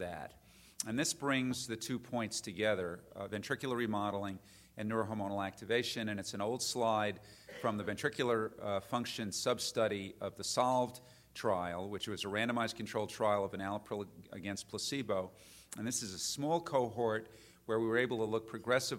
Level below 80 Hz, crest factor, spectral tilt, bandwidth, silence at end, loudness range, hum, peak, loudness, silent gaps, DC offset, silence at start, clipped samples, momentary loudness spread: -70 dBFS; 20 dB; -4 dB/octave; 16 kHz; 0 s; 2 LU; none; -16 dBFS; -37 LUFS; none; under 0.1%; 0 s; under 0.1%; 10 LU